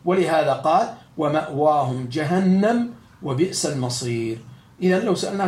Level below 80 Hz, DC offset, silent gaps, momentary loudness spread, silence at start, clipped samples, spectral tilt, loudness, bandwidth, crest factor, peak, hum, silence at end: -62 dBFS; under 0.1%; none; 10 LU; 0.05 s; under 0.1%; -5.5 dB/octave; -21 LUFS; 14 kHz; 16 dB; -6 dBFS; none; 0 s